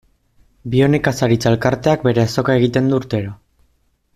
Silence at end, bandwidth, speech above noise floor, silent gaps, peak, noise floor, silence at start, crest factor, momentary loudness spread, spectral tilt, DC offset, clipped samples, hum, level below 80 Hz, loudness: 0.8 s; 14 kHz; 46 dB; none; -2 dBFS; -61 dBFS; 0.65 s; 14 dB; 8 LU; -6.5 dB/octave; under 0.1%; under 0.1%; none; -46 dBFS; -16 LUFS